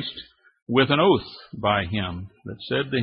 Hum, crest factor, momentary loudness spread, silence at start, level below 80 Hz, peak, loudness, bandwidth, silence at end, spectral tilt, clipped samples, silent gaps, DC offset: none; 18 dB; 20 LU; 0 s; -52 dBFS; -6 dBFS; -23 LUFS; 5.4 kHz; 0 s; -10 dB/octave; under 0.1%; 0.62-0.67 s; under 0.1%